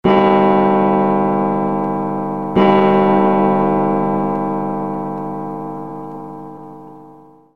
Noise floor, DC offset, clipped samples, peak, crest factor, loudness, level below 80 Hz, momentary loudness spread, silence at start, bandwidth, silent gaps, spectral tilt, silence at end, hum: -43 dBFS; 0.9%; under 0.1%; 0 dBFS; 14 dB; -16 LUFS; -50 dBFS; 17 LU; 0.05 s; 5.4 kHz; none; -9.5 dB/octave; 0.3 s; none